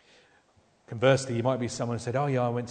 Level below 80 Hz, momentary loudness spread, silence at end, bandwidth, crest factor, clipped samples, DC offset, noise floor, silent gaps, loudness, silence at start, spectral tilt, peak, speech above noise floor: -64 dBFS; 7 LU; 0 s; 9.4 kHz; 20 dB; under 0.1%; under 0.1%; -64 dBFS; none; -27 LUFS; 0.9 s; -6 dB/octave; -10 dBFS; 37 dB